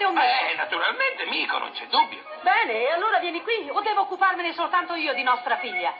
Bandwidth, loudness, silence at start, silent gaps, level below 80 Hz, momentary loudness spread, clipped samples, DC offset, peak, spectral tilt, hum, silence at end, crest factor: 5.4 kHz; -23 LUFS; 0 s; none; -88 dBFS; 5 LU; under 0.1%; under 0.1%; -8 dBFS; -4 dB/octave; none; 0 s; 16 dB